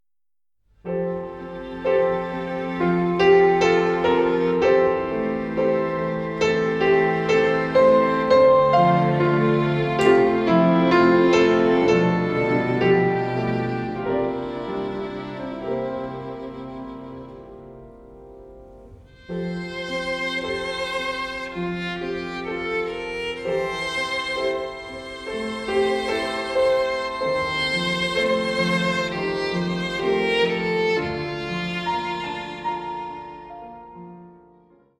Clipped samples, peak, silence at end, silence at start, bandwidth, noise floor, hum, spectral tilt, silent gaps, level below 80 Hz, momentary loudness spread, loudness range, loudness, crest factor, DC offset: under 0.1%; -4 dBFS; 0.7 s; 0.85 s; 11.5 kHz; under -90 dBFS; none; -6 dB/octave; none; -50 dBFS; 16 LU; 13 LU; -21 LUFS; 18 dB; under 0.1%